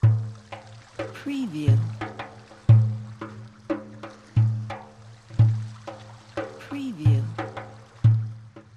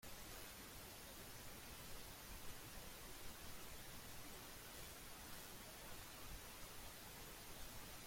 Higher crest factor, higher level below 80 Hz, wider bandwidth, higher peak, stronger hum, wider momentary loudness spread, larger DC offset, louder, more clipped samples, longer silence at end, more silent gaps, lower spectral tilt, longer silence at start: about the same, 18 dB vs 18 dB; first, -50 dBFS vs -64 dBFS; second, 7 kHz vs 16.5 kHz; first, -6 dBFS vs -38 dBFS; neither; first, 20 LU vs 1 LU; neither; first, -25 LUFS vs -55 LUFS; neither; first, 0.15 s vs 0 s; neither; first, -8.5 dB/octave vs -2.5 dB/octave; about the same, 0 s vs 0 s